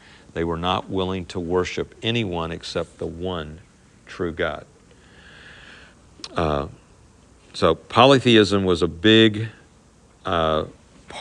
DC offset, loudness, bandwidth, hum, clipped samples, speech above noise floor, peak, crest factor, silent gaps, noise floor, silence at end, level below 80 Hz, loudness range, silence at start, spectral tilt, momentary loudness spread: under 0.1%; -21 LUFS; 10.5 kHz; none; under 0.1%; 32 dB; 0 dBFS; 22 dB; none; -53 dBFS; 0 s; -48 dBFS; 13 LU; 0.35 s; -5.5 dB/octave; 20 LU